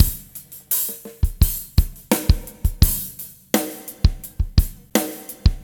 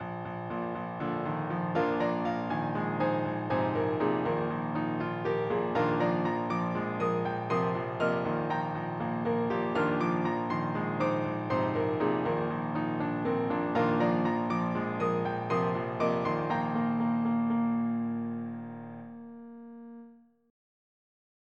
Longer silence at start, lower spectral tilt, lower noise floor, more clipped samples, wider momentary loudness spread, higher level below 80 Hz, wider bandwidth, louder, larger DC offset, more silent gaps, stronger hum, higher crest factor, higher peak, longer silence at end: about the same, 0 s vs 0 s; second, -4.5 dB/octave vs -8.5 dB/octave; second, -41 dBFS vs -55 dBFS; neither; first, 11 LU vs 8 LU; first, -24 dBFS vs -64 dBFS; first, over 20 kHz vs 7.8 kHz; first, -22 LUFS vs -30 LUFS; neither; neither; neither; about the same, 20 dB vs 16 dB; first, 0 dBFS vs -14 dBFS; second, 0 s vs 1.35 s